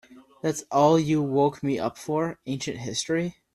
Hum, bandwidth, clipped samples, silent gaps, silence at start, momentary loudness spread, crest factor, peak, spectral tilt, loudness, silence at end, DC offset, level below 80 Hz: none; 13.5 kHz; under 0.1%; none; 0.1 s; 11 LU; 18 dB; -6 dBFS; -5.5 dB/octave; -25 LUFS; 0.25 s; under 0.1%; -62 dBFS